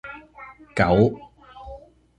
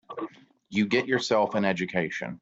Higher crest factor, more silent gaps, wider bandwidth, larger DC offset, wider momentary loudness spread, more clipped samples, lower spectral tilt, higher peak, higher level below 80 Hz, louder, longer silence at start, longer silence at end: about the same, 22 dB vs 18 dB; neither; first, 9.8 kHz vs 7.8 kHz; neither; first, 25 LU vs 14 LU; neither; first, -8 dB/octave vs -5 dB/octave; first, -2 dBFS vs -10 dBFS; first, -44 dBFS vs -66 dBFS; first, -21 LUFS vs -26 LUFS; about the same, 0.05 s vs 0.1 s; first, 0.4 s vs 0.05 s